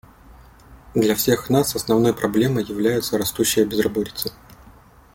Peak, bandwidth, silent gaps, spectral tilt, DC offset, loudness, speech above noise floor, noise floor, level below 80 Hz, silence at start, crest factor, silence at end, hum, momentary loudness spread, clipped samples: -4 dBFS; 17 kHz; none; -4.5 dB/octave; under 0.1%; -20 LUFS; 28 dB; -48 dBFS; -48 dBFS; 0.3 s; 18 dB; 0.45 s; none; 7 LU; under 0.1%